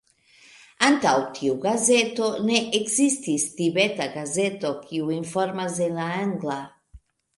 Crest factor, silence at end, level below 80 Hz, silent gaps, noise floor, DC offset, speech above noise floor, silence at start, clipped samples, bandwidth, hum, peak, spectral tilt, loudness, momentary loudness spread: 22 dB; 0.4 s; -62 dBFS; none; -55 dBFS; under 0.1%; 31 dB; 0.8 s; under 0.1%; 11.5 kHz; none; -2 dBFS; -3.5 dB/octave; -23 LUFS; 9 LU